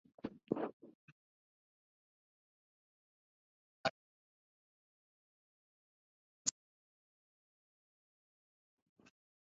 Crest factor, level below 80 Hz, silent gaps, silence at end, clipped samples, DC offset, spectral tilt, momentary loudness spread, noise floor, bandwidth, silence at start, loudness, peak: 34 dB; -84 dBFS; 0.73-0.80 s, 0.95-3.84 s, 3.90-6.45 s; 2.95 s; under 0.1%; under 0.1%; -3 dB/octave; 9 LU; under -90 dBFS; 5.2 kHz; 0.25 s; -43 LUFS; -18 dBFS